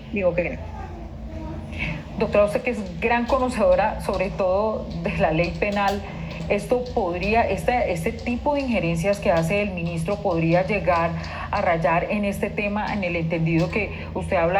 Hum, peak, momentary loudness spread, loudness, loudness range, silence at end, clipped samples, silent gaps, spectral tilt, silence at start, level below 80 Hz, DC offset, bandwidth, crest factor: none; -6 dBFS; 9 LU; -23 LUFS; 2 LU; 0 s; under 0.1%; none; -6.5 dB/octave; 0 s; -38 dBFS; under 0.1%; 14 kHz; 18 dB